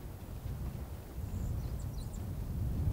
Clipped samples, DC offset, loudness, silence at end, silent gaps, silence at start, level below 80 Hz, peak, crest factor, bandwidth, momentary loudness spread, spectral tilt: under 0.1%; under 0.1%; -41 LUFS; 0 s; none; 0 s; -42 dBFS; -22 dBFS; 16 dB; 16 kHz; 7 LU; -7.5 dB/octave